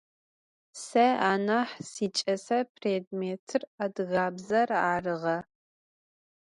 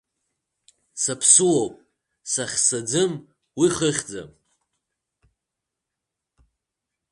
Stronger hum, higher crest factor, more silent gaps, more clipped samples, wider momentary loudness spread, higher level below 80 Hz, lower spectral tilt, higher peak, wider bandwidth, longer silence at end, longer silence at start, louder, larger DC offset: neither; second, 18 dB vs 24 dB; first, 2.69-2.75 s, 3.07-3.11 s, 3.39-3.47 s, 3.67-3.78 s vs none; neither; second, 10 LU vs 23 LU; second, -72 dBFS vs -62 dBFS; first, -4.5 dB/octave vs -3 dB/octave; second, -12 dBFS vs -2 dBFS; about the same, 11.5 kHz vs 11.5 kHz; second, 1.05 s vs 2.85 s; second, 0.75 s vs 0.95 s; second, -29 LUFS vs -20 LUFS; neither